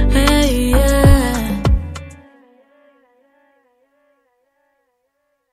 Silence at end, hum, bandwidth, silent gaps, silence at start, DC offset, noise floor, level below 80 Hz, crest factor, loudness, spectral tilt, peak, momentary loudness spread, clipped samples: 3.4 s; none; 15 kHz; none; 0 s; under 0.1%; -69 dBFS; -20 dBFS; 18 dB; -15 LUFS; -5.5 dB/octave; 0 dBFS; 18 LU; under 0.1%